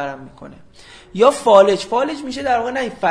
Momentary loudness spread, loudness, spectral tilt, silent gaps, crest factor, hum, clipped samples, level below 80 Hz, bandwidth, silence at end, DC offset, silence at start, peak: 17 LU; -16 LUFS; -4.5 dB/octave; none; 18 dB; none; under 0.1%; -52 dBFS; 11 kHz; 0 s; under 0.1%; 0 s; 0 dBFS